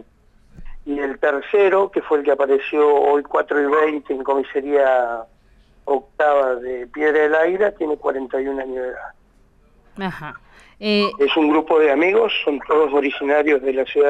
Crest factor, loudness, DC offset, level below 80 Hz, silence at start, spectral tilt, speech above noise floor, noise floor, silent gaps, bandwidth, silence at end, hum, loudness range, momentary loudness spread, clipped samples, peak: 12 dB; -18 LUFS; under 0.1%; -48 dBFS; 0.6 s; -6 dB/octave; 36 dB; -54 dBFS; none; 7.8 kHz; 0 s; none; 6 LU; 12 LU; under 0.1%; -6 dBFS